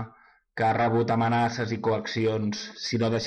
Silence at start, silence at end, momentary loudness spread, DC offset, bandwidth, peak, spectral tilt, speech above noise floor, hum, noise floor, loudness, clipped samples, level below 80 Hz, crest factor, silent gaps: 0 s; 0 s; 8 LU; under 0.1%; 8.8 kHz; -16 dBFS; -6 dB/octave; 31 dB; none; -56 dBFS; -26 LUFS; under 0.1%; -60 dBFS; 10 dB; none